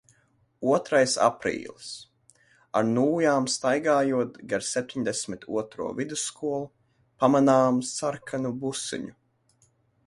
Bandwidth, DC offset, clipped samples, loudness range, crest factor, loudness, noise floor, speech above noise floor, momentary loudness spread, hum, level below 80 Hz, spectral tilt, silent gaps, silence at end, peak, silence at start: 11.5 kHz; under 0.1%; under 0.1%; 2 LU; 22 dB; -26 LUFS; -66 dBFS; 40 dB; 13 LU; none; -66 dBFS; -4.5 dB/octave; none; 1 s; -6 dBFS; 0.6 s